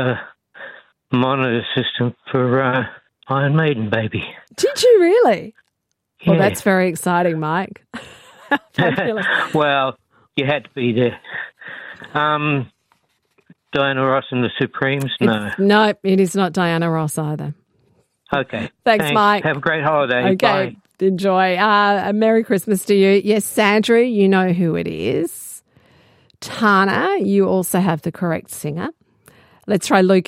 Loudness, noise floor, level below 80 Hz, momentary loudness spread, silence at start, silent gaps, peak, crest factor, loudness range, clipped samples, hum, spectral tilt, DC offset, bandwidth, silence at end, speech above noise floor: -17 LUFS; -74 dBFS; -60 dBFS; 14 LU; 0 s; none; 0 dBFS; 18 dB; 5 LU; under 0.1%; none; -5.5 dB/octave; under 0.1%; 16 kHz; 0.05 s; 57 dB